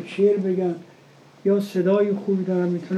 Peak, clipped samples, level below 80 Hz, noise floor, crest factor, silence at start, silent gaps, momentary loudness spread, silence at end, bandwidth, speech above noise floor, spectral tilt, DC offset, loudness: -8 dBFS; under 0.1%; -82 dBFS; -50 dBFS; 14 dB; 0 s; none; 7 LU; 0 s; 13 kHz; 29 dB; -8.5 dB/octave; under 0.1%; -22 LUFS